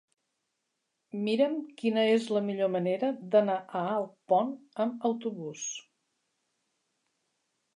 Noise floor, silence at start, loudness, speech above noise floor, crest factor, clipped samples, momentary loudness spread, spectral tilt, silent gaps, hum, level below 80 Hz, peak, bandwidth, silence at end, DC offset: -82 dBFS; 1.15 s; -30 LUFS; 53 dB; 20 dB; under 0.1%; 11 LU; -5 dB/octave; none; none; -86 dBFS; -12 dBFS; 11 kHz; 1.95 s; under 0.1%